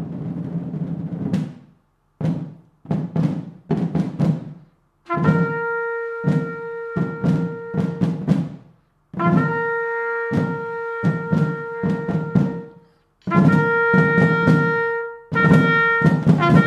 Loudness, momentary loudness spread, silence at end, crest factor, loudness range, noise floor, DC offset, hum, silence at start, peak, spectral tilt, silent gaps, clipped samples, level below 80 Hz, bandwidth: -20 LUFS; 12 LU; 0 s; 20 dB; 8 LU; -60 dBFS; under 0.1%; none; 0 s; 0 dBFS; -8.5 dB/octave; none; under 0.1%; -50 dBFS; 7.6 kHz